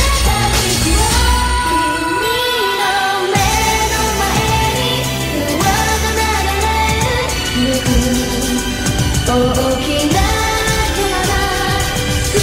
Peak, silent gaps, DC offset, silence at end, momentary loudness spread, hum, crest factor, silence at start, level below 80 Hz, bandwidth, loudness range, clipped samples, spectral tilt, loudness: 0 dBFS; none; under 0.1%; 0 s; 3 LU; none; 14 dB; 0 s; -22 dBFS; 16.5 kHz; 1 LU; under 0.1%; -3.5 dB/octave; -14 LUFS